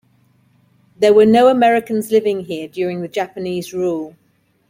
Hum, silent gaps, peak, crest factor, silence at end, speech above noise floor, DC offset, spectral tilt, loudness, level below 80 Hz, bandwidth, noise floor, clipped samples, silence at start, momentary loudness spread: none; none; -2 dBFS; 16 dB; 0.6 s; 41 dB; under 0.1%; -5.5 dB/octave; -16 LUFS; -60 dBFS; 16.5 kHz; -56 dBFS; under 0.1%; 1 s; 13 LU